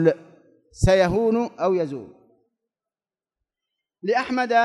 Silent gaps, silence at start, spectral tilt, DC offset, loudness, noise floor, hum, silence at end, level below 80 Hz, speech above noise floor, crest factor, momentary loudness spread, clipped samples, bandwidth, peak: none; 0 s; -6.5 dB/octave; under 0.1%; -22 LUFS; under -90 dBFS; none; 0 s; -40 dBFS; over 70 dB; 18 dB; 13 LU; under 0.1%; 12 kHz; -4 dBFS